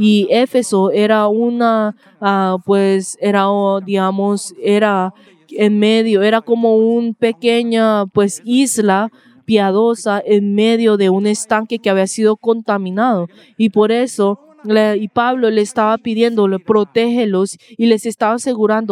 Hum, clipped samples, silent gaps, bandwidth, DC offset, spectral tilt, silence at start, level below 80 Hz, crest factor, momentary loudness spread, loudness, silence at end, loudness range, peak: none; under 0.1%; none; 14.5 kHz; under 0.1%; -5 dB/octave; 0 s; -66 dBFS; 14 dB; 5 LU; -15 LUFS; 0 s; 2 LU; 0 dBFS